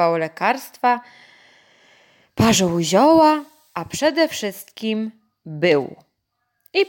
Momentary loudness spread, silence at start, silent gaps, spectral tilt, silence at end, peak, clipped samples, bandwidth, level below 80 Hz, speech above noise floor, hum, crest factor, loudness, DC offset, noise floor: 18 LU; 0 s; none; -4.5 dB/octave; 0 s; -4 dBFS; under 0.1%; 17 kHz; -54 dBFS; 55 dB; none; 16 dB; -19 LUFS; under 0.1%; -74 dBFS